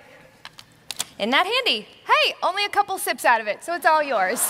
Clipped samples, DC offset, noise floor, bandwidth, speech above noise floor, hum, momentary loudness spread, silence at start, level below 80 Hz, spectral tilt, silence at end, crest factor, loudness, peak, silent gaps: under 0.1%; under 0.1%; -46 dBFS; 16 kHz; 25 dB; none; 8 LU; 0.45 s; -70 dBFS; -0.5 dB/octave; 0 s; 18 dB; -21 LUFS; -4 dBFS; none